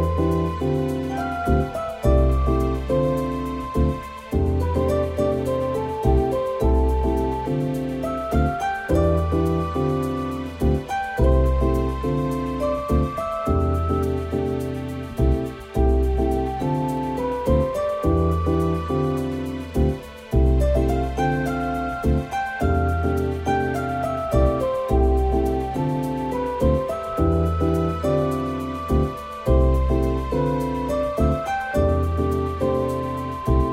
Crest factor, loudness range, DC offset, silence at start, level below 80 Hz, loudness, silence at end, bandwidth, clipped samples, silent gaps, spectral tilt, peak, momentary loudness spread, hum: 14 dB; 1 LU; under 0.1%; 0 s; -26 dBFS; -23 LUFS; 0 s; 15 kHz; under 0.1%; none; -8 dB/octave; -6 dBFS; 6 LU; none